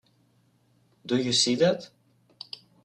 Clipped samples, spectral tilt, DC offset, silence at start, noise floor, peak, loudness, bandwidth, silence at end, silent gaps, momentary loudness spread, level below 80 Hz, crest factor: under 0.1%; -3.5 dB/octave; under 0.1%; 1.05 s; -66 dBFS; -10 dBFS; -24 LUFS; 10.5 kHz; 1 s; none; 22 LU; -70 dBFS; 20 dB